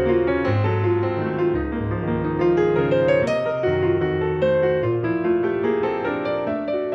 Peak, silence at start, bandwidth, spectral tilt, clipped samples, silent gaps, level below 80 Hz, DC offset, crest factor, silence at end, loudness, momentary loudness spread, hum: -8 dBFS; 0 s; 7 kHz; -8.5 dB/octave; under 0.1%; none; -42 dBFS; under 0.1%; 12 dB; 0 s; -21 LUFS; 5 LU; none